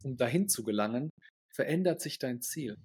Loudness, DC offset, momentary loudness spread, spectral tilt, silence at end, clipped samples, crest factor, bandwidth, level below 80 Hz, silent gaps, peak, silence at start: -32 LUFS; under 0.1%; 8 LU; -4.5 dB/octave; 0.05 s; under 0.1%; 18 dB; 17.5 kHz; -74 dBFS; 1.10-1.17 s, 1.30-1.49 s; -14 dBFS; 0 s